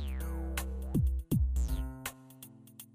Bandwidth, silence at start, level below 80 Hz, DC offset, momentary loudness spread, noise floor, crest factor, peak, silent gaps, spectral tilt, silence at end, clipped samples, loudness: 16 kHz; 0 s; -36 dBFS; under 0.1%; 19 LU; -54 dBFS; 16 dB; -18 dBFS; none; -6 dB/octave; 0.1 s; under 0.1%; -35 LUFS